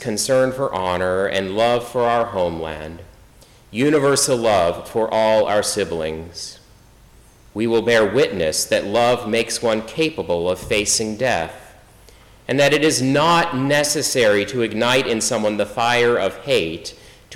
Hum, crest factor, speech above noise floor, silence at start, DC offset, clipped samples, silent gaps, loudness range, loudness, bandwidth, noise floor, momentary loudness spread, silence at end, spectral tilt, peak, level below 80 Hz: none; 12 dB; 30 dB; 0 s; under 0.1%; under 0.1%; none; 4 LU; -18 LUFS; 17.5 kHz; -48 dBFS; 11 LU; 0 s; -3.5 dB/octave; -8 dBFS; -50 dBFS